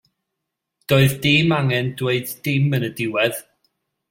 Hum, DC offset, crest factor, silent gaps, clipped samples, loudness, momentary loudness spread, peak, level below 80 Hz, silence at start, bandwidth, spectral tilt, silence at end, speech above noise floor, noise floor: none; under 0.1%; 18 dB; none; under 0.1%; -19 LUFS; 7 LU; -2 dBFS; -54 dBFS; 0.9 s; 16.5 kHz; -5.5 dB/octave; 0.7 s; 62 dB; -80 dBFS